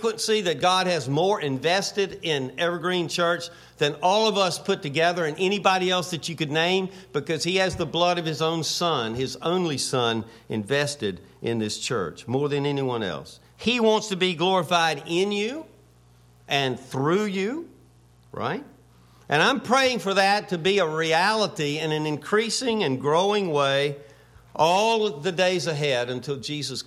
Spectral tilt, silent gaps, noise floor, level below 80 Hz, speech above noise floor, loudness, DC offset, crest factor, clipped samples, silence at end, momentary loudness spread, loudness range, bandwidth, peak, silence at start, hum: -4 dB/octave; none; -55 dBFS; -62 dBFS; 31 dB; -24 LUFS; under 0.1%; 20 dB; under 0.1%; 0.05 s; 9 LU; 4 LU; 15 kHz; -6 dBFS; 0 s; none